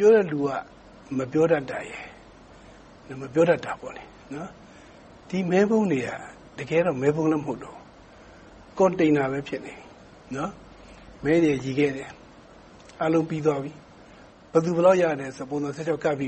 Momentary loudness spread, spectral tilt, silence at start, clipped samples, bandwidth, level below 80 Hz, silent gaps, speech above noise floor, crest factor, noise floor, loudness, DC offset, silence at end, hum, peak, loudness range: 19 LU; -7 dB/octave; 0 s; under 0.1%; 8.4 kHz; -58 dBFS; none; 26 dB; 20 dB; -49 dBFS; -24 LUFS; under 0.1%; 0 s; none; -6 dBFS; 3 LU